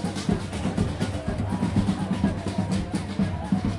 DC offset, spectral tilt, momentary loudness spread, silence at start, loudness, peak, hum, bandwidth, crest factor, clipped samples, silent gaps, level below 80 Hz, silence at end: under 0.1%; -6.5 dB/octave; 4 LU; 0 s; -27 LUFS; -10 dBFS; none; 11.5 kHz; 16 dB; under 0.1%; none; -40 dBFS; 0 s